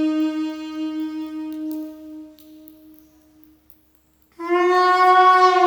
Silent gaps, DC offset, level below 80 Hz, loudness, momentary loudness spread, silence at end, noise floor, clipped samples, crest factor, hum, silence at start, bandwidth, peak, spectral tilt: none; under 0.1%; -66 dBFS; -18 LUFS; 22 LU; 0 s; -59 dBFS; under 0.1%; 18 dB; none; 0 s; over 20 kHz; -2 dBFS; -2.5 dB/octave